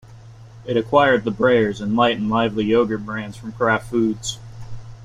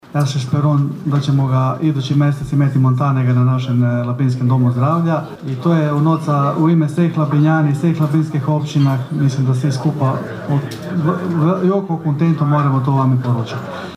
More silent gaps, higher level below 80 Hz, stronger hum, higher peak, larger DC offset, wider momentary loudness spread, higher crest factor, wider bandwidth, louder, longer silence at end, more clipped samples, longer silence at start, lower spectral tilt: neither; about the same, -48 dBFS vs -52 dBFS; neither; about the same, -2 dBFS vs -2 dBFS; neither; first, 18 LU vs 5 LU; first, 18 dB vs 12 dB; about the same, 11.5 kHz vs 11 kHz; second, -19 LUFS vs -16 LUFS; about the same, 0 s vs 0 s; neither; about the same, 0.1 s vs 0.1 s; second, -5.5 dB/octave vs -8.5 dB/octave